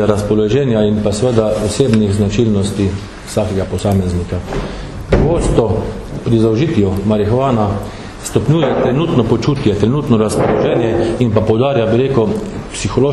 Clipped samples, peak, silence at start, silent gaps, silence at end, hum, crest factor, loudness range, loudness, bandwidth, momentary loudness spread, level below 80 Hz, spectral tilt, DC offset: under 0.1%; 0 dBFS; 0 s; none; 0 s; none; 14 dB; 3 LU; -14 LUFS; 13 kHz; 8 LU; -30 dBFS; -7 dB/octave; under 0.1%